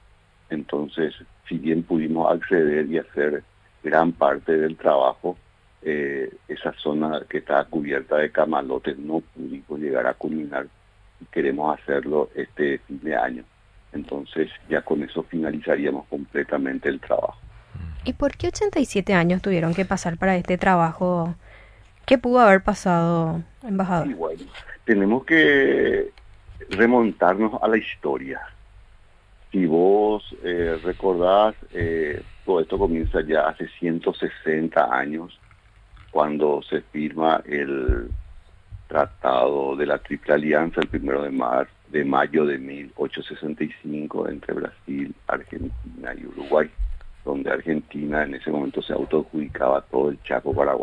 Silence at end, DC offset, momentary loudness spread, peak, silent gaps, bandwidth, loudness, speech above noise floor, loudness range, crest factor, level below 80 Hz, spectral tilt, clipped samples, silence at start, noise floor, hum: 0 s; under 0.1%; 13 LU; -4 dBFS; none; 11 kHz; -23 LUFS; 33 dB; 7 LU; 20 dB; -42 dBFS; -6.5 dB/octave; under 0.1%; 0.5 s; -55 dBFS; none